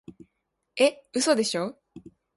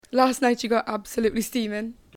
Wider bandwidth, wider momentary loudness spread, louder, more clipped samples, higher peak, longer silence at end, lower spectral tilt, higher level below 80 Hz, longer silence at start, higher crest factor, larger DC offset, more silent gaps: second, 11.5 kHz vs 17.5 kHz; about the same, 11 LU vs 9 LU; about the same, -25 LUFS vs -24 LUFS; neither; about the same, -8 dBFS vs -6 dBFS; about the same, 0.35 s vs 0.25 s; about the same, -3 dB/octave vs -4 dB/octave; second, -70 dBFS vs -54 dBFS; first, 0.75 s vs 0.1 s; about the same, 20 dB vs 18 dB; neither; neither